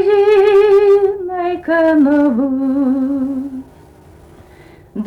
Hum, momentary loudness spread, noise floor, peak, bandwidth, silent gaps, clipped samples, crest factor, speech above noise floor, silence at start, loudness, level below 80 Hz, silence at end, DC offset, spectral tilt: none; 13 LU; -42 dBFS; -4 dBFS; 5.8 kHz; none; under 0.1%; 10 dB; 29 dB; 0 s; -13 LUFS; -48 dBFS; 0 s; under 0.1%; -7 dB/octave